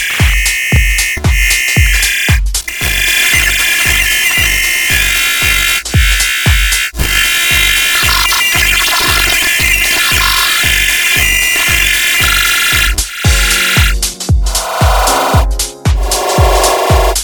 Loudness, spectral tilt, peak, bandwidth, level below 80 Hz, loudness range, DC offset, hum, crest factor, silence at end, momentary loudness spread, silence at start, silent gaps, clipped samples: -9 LUFS; -2 dB/octave; 0 dBFS; over 20 kHz; -18 dBFS; 3 LU; 0.1%; none; 10 dB; 0 s; 5 LU; 0 s; none; under 0.1%